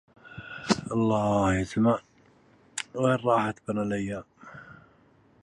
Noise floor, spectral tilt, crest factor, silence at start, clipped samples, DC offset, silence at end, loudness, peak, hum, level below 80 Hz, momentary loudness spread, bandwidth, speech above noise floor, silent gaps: -60 dBFS; -6 dB/octave; 22 dB; 0.25 s; under 0.1%; under 0.1%; 0.7 s; -27 LUFS; -6 dBFS; none; -52 dBFS; 22 LU; 11.5 kHz; 35 dB; none